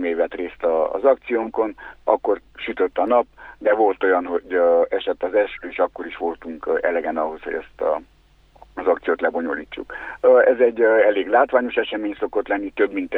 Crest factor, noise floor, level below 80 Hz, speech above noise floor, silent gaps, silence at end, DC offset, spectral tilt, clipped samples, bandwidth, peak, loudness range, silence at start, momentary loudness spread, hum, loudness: 18 dB; -50 dBFS; -54 dBFS; 30 dB; none; 0 s; under 0.1%; -6.5 dB/octave; under 0.1%; 4.1 kHz; -2 dBFS; 7 LU; 0 s; 12 LU; none; -21 LUFS